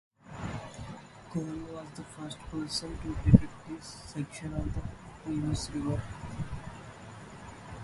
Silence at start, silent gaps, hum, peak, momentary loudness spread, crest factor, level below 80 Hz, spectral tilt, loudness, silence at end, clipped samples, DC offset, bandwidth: 0.25 s; none; none; -2 dBFS; 17 LU; 30 dB; -44 dBFS; -6.5 dB/octave; -34 LUFS; 0 s; under 0.1%; under 0.1%; 11.5 kHz